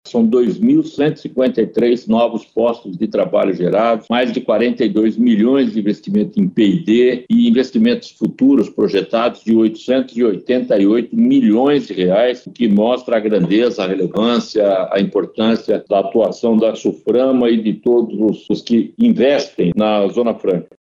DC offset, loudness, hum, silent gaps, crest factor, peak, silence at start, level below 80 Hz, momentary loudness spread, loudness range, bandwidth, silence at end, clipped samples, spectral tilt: under 0.1%; -15 LUFS; none; none; 12 dB; -4 dBFS; 0.05 s; -58 dBFS; 5 LU; 2 LU; 7.4 kHz; 0.15 s; under 0.1%; -7 dB/octave